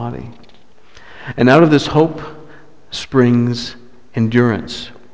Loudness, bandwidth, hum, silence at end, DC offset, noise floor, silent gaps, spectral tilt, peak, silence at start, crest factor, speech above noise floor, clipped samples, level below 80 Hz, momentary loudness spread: -14 LUFS; 8 kHz; none; 0.25 s; 1%; -49 dBFS; none; -7 dB/octave; 0 dBFS; 0 s; 16 dB; 35 dB; under 0.1%; -46 dBFS; 21 LU